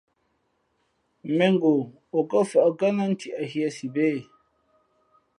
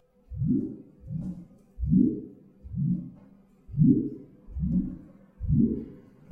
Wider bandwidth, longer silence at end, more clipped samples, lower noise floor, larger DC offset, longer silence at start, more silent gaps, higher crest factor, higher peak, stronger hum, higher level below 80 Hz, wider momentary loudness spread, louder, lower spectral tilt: first, 11.5 kHz vs 1.7 kHz; first, 1.15 s vs 0.3 s; neither; first, -72 dBFS vs -55 dBFS; neither; first, 1.25 s vs 0.3 s; neither; about the same, 18 dB vs 20 dB; first, -6 dBFS vs -10 dBFS; neither; second, -76 dBFS vs -42 dBFS; second, 9 LU vs 22 LU; first, -24 LUFS vs -28 LUFS; second, -6.5 dB/octave vs -14 dB/octave